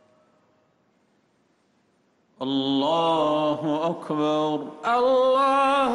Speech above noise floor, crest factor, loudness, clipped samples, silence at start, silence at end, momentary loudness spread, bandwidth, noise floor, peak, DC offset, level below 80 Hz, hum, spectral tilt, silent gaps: 44 dB; 12 dB; -23 LUFS; under 0.1%; 2.4 s; 0 s; 8 LU; 11.5 kHz; -66 dBFS; -12 dBFS; under 0.1%; -66 dBFS; none; -5.5 dB/octave; none